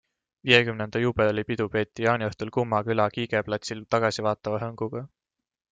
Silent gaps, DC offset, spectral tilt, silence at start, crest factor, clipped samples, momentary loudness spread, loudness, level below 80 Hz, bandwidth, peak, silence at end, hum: none; under 0.1%; -5.5 dB/octave; 0.45 s; 24 dB; under 0.1%; 12 LU; -26 LUFS; -58 dBFS; 9.2 kHz; -2 dBFS; 0.65 s; none